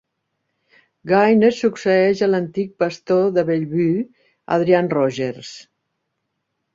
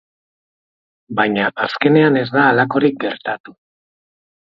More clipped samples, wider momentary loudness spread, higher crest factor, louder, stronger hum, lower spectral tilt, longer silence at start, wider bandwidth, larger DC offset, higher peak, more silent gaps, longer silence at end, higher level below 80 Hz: neither; about the same, 11 LU vs 12 LU; about the same, 18 dB vs 18 dB; about the same, -18 LUFS vs -16 LUFS; neither; second, -7 dB/octave vs -8.5 dB/octave; about the same, 1.05 s vs 1.1 s; first, 7.6 kHz vs 5.8 kHz; neither; about the same, -2 dBFS vs 0 dBFS; second, none vs 3.40-3.44 s; first, 1.15 s vs 1 s; about the same, -62 dBFS vs -62 dBFS